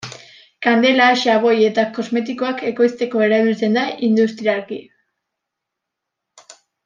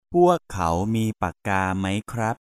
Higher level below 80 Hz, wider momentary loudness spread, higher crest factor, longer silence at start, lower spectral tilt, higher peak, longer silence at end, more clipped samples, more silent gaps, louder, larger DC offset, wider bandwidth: second, -70 dBFS vs -46 dBFS; about the same, 9 LU vs 8 LU; about the same, 16 dB vs 16 dB; about the same, 0.05 s vs 0.1 s; second, -5 dB/octave vs -6.5 dB/octave; first, -2 dBFS vs -6 dBFS; first, 2.05 s vs 0.1 s; neither; neither; first, -17 LUFS vs -23 LUFS; neither; second, 7.4 kHz vs 14.5 kHz